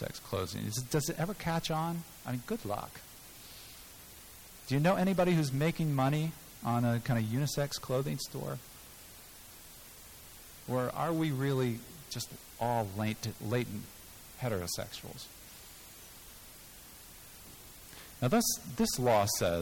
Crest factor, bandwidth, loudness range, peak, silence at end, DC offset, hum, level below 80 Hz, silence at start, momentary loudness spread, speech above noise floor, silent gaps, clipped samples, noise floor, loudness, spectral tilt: 16 dB; 19 kHz; 10 LU; -18 dBFS; 0 s; under 0.1%; none; -58 dBFS; 0 s; 21 LU; 20 dB; none; under 0.1%; -52 dBFS; -33 LUFS; -5 dB/octave